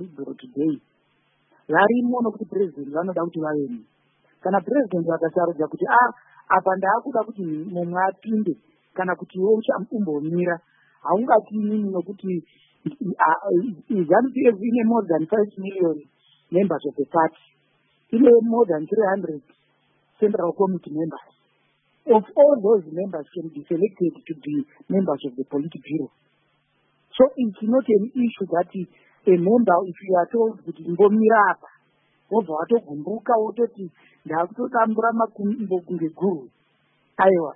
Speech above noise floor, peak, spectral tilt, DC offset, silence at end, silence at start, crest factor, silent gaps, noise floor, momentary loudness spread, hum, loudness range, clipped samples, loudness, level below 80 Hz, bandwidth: 45 dB; -4 dBFS; -12 dB/octave; under 0.1%; 0 s; 0 s; 18 dB; none; -66 dBFS; 13 LU; none; 4 LU; under 0.1%; -22 LUFS; -70 dBFS; 3.8 kHz